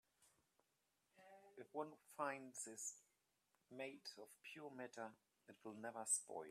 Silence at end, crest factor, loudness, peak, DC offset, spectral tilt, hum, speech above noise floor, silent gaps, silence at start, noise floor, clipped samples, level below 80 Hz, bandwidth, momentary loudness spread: 0 s; 24 dB; -50 LUFS; -30 dBFS; under 0.1%; -2 dB/octave; none; 35 dB; none; 0.2 s; -87 dBFS; under 0.1%; under -90 dBFS; 14.5 kHz; 21 LU